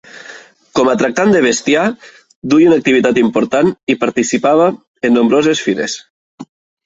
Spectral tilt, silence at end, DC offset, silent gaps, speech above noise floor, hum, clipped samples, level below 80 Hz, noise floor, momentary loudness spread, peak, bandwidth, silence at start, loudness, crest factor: -4.5 dB/octave; 0.4 s; under 0.1%; 2.36-2.42 s, 3.83-3.87 s, 4.87-4.95 s, 6.10-6.38 s; 25 dB; none; under 0.1%; -54 dBFS; -37 dBFS; 10 LU; 0 dBFS; 8 kHz; 0.15 s; -13 LUFS; 12 dB